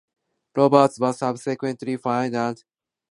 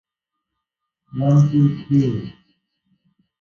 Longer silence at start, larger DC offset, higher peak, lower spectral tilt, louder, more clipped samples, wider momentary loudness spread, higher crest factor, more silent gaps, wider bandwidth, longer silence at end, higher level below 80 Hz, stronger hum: second, 0.55 s vs 1.15 s; neither; about the same, -2 dBFS vs -4 dBFS; second, -6.5 dB/octave vs -9.5 dB/octave; second, -22 LUFS vs -18 LUFS; neither; second, 12 LU vs 17 LU; first, 22 dB vs 16 dB; neither; first, 11.5 kHz vs 6.8 kHz; second, 0.6 s vs 1.1 s; second, -70 dBFS vs -56 dBFS; neither